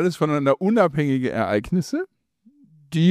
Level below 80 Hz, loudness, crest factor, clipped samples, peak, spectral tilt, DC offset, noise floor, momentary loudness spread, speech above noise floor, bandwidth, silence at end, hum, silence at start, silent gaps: -52 dBFS; -21 LUFS; 16 dB; under 0.1%; -6 dBFS; -7 dB/octave; under 0.1%; -58 dBFS; 10 LU; 37 dB; 14.5 kHz; 0 s; none; 0 s; none